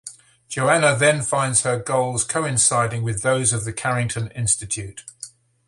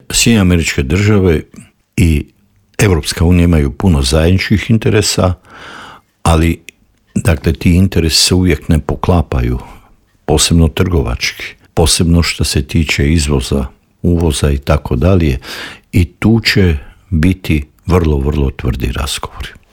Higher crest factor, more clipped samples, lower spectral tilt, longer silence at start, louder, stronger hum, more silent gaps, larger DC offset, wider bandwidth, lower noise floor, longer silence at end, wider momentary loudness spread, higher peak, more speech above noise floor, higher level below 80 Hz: first, 20 dB vs 12 dB; neither; second, -3.5 dB/octave vs -5 dB/octave; about the same, 0.05 s vs 0.1 s; second, -20 LUFS vs -13 LUFS; neither; neither; neither; second, 11.5 kHz vs 17.5 kHz; about the same, -42 dBFS vs -45 dBFS; first, 0.4 s vs 0.2 s; first, 18 LU vs 12 LU; about the same, -2 dBFS vs 0 dBFS; second, 21 dB vs 34 dB; second, -50 dBFS vs -24 dBFS